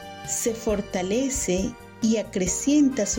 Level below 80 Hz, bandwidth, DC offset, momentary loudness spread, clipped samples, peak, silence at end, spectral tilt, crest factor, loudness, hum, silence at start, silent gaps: -44 dBFS; 17 kHz; under 0.1%; 7 LU; under 0.1%; -12 dBFS; 0 s; -4 dB/octave; 14 dB; -24 LUFS; none; 0 s; none